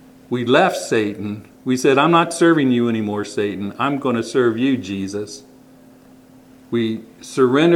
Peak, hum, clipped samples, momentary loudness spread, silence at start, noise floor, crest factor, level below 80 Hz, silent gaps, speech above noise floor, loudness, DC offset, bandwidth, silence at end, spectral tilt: 0 dBFS; none; under 0.1%; 14 LU; 0.3 s; -46 dBFS; 18 dB; -64 dBFS; none; 29 dB; -18 LUFS; under 0.1%; 14 kHz; 0 s; -5.5 dB/octave